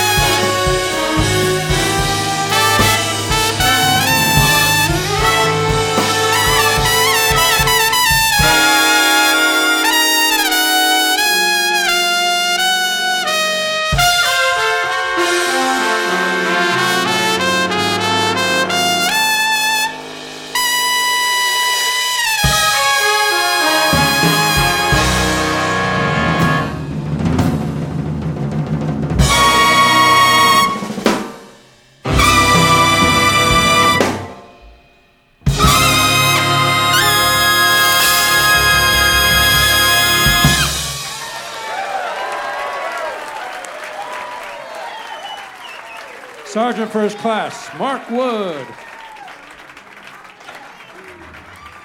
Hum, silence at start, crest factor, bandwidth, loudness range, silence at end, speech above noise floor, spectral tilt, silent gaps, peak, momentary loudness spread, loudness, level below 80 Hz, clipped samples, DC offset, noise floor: none; 0 s; 14 dB; over 20 kHz; 12 LU; 0 s; 32 dB; -2.5 dB/octave; none; 0 dBFS; 15 LU; -13 LUFS; -32 dBFS; under 0.1%; under 0.1%; -52 dBFS